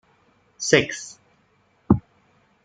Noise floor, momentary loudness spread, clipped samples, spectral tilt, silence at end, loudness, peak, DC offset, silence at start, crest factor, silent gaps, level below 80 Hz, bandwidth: -63 dBFS; 15 LU; under 0.1%; -4.5 dB/octave; 0.65 s; -22 LUFS; -2 dBFS; under 0.1%; 0.6 s; 24 dB; none; -48 dBFS; 9.4 kHz